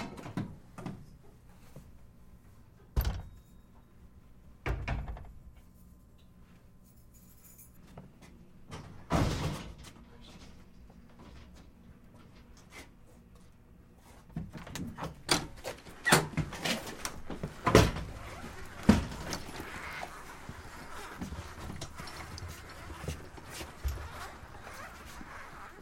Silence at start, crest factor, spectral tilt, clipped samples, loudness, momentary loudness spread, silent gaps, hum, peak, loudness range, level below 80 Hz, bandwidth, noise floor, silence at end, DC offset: 0 s; 34 dB; -4.5 dB/octave; under 0.1%; -35 LUFS; 27 LU; none; none; -4 dBFS; 23 LU; -46 dBFS; 16.5 kHz; -57 dBFS; 0 s; under 0.1%